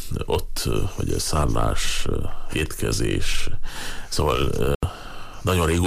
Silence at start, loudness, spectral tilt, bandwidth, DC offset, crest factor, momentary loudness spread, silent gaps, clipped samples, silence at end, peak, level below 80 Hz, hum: 0 s; -25 LUFS; -4.5 dB/octave; 15.5 kHz; under 0.1%; 12 dB; 9 LU; 4.75-4.80 s; under 0.1%; 0 s; -10 dBFS; -28 dBFS; none